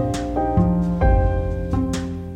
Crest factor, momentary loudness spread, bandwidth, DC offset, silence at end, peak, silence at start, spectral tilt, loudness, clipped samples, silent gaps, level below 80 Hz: 14 dB; 6 LU; 10.5 kHz; under 0.1%; 0 s; -6 dBFS; 0 s; -7.5 dB/octave; -21 LUFS; under 0.1%; none; -24 dBFS